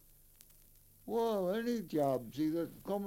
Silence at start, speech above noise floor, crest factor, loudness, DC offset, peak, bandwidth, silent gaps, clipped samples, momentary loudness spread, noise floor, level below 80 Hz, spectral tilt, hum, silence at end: 1.05 s; 27 dB; 16 dB; -36 LUFS; under 0.1%; -22 dBFS; 17 kHz; none; under 0.1%; 6 LU; -63 dBFS; -66 dBFS; -6.5 dB/octave; none; 0 s